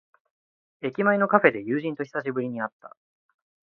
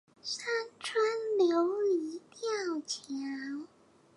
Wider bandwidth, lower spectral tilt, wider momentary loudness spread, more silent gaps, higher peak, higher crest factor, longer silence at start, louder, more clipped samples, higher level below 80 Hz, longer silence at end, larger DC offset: second, 6.4 kHz vs 11.5 kHz; first, -8.5 dB/octave vs -2 dB/octave; about the same, 13 LU vs 12 LU; first, 2.73-2.80 s vs none; first, -2 dBFS vs -18 dBFS; first, 24 dB vs 16 dB; first, 0.85 s vs 0.25 s; first, -25 LUFS vs -33 LUFS; neither; first, -74 dBFS vs -86 dBFS; first, 0.75 s vs 0.5 s; neither